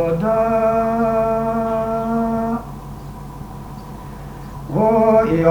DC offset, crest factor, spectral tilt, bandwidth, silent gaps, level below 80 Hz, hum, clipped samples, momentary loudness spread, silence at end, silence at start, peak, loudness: under 0.1%; 18 dB; -8.5 dB/octave; over 20 kHz; none; -38 dBFS; none; under 0.1%; 19 LU; 0 s; 0 s; 0 dBFS; -18 LUFS